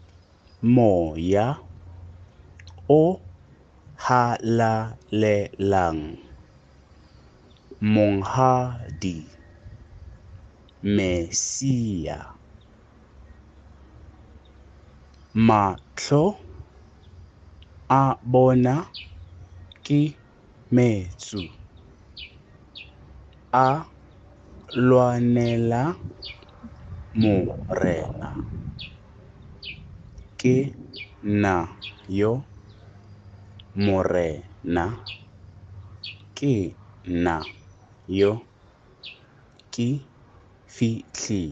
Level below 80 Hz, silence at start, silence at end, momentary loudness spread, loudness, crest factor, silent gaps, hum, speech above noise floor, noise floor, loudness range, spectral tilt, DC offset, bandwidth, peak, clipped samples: -50 dBFS; 0.6 s; 0 s; 23 LU; -23 LUFS; 22 dB; none; none; 32 dB; -54 dBFS; 6 LU; -6.5 dB/octave; under 0.1%; 8.4 kHz; -4 dBFS; under 0.1%